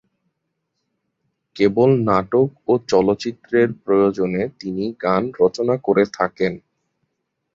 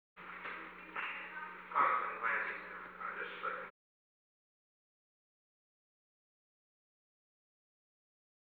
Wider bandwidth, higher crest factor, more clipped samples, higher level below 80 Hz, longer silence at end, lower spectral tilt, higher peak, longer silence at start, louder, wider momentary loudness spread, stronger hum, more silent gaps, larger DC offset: second, 7.4 kHz vs over 20 kHz; second, 18 dB vs 24 dB; neither; first, -54 dBFS vs -82 dBFS; second, 0.95 s vs 4.8 s; first, -7 dB/octave vs -5 dB/octave; first, -2 dBFS vs -20 dBFS; first, 1.55 s vs 0.15 s; first, -19 LUFS vs -39 LUFS; second, 8 LU vs 14 LU; neither; neither; neither